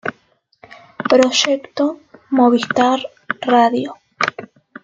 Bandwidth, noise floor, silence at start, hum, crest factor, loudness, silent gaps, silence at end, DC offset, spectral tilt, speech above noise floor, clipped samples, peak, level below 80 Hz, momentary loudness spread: 7.8 kHz; -59 dBFS; 0.05 s; none; 18 dB; -16 LUFS; none; 0.4 s; under 0.1%; -3 dB/octave; 44 dB; under 0.1%; 0 dBFS; -62 dBFS; 14 LU